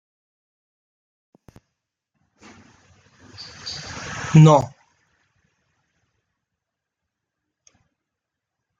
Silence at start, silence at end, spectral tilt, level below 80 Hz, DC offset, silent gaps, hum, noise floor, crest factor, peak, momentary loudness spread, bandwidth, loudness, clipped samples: 3.65 s; 4.15 s; -7 dB/octave; -58 dBFS; under 0.1%; none; none; -83 dBFS; 22 dB; -2 dBFS; 25 LU; 7.6 kHz; -17 LUFS; under 0.1%